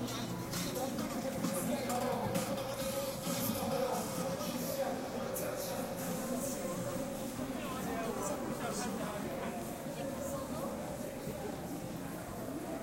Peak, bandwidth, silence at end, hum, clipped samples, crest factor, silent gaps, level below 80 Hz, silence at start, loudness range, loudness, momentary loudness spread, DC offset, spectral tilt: -20 dBFS; 16 kHz; 0 s; none; under 0.1%; 18 dB; none; -58 dBFS; 0 s; 4 LU; -38 LUFS; 6 LU; under 0.1%; -4.5 dB/octave